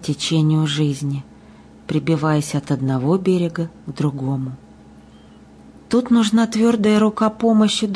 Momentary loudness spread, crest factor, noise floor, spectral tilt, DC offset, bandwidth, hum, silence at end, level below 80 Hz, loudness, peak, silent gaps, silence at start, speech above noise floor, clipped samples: 11 LU; 12 dB; -45 dBFS; -6 dB/octave; under 0.1%; 11 kHz; none; 0 s; -54 dBFS; -19 LUFS; -6 dBFS; none; 0 s; 27 dB; under 0.1%